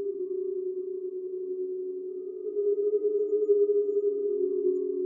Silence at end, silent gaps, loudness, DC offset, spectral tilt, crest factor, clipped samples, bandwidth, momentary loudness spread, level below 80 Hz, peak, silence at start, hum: 0 s; none; -29 LUFS; under 0.1%; -11 dB/octave; 14 dB; under 0.1%; 1.3 kHz; 11 LU; under -90 dBFS; -14 dBFS; 0 s; none